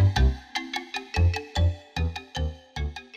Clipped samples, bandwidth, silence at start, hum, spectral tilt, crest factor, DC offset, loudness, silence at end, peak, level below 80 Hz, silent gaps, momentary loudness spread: under 0.1%; 9.4 kHz; 0 s; none; -5.5 dB/octave; 16 dB; under 0.1%; -28 LUFS; 0 s; -10 dBFS; -30 dBFS; none; 9 LU